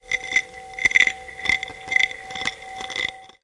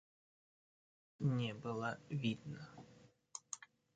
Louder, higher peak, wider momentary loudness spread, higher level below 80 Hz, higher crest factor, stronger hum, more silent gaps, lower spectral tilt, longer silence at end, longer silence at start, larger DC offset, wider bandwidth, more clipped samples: first, -21 LUFS vs -43 LUFS; first, 0 dBFS vs -26 dBFS; second, 12 LU vs 16 LU; first, -54 dBFS vs -76 dBFS; about the same, 24 dB vs 20 dB; neither; neither; second, 0 dB/octave vs -5.5 dB/octave; second, 0.15 s vs 0.3 s; second, 0.05 s vs 1.2 s; neither; first, 11.5 kHz vs 9 kHz; neither